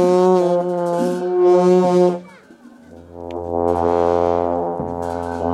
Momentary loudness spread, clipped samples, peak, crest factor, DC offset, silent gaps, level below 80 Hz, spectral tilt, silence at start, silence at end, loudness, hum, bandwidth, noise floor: 11 LU; under 0.1%; -2 dBFS; 14 dB; under 0.1%; none; -46 dBFS; -8 dB/octave; 0 s; 0 s; -17 LUFS; none; 11 kHz; -44 dBFS